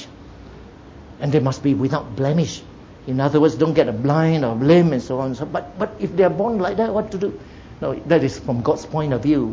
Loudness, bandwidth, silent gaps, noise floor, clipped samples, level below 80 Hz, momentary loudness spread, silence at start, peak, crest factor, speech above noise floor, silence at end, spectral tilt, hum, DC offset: -20 LUFS; 7.6 kHz; none; -41 dBFS; under 0.1%; -46 dBFS; 11 LU; 0 s; -2 dBFS; 18 dB; 22 dB; 0 s; -7.5 dB/octave; none; under 0.1%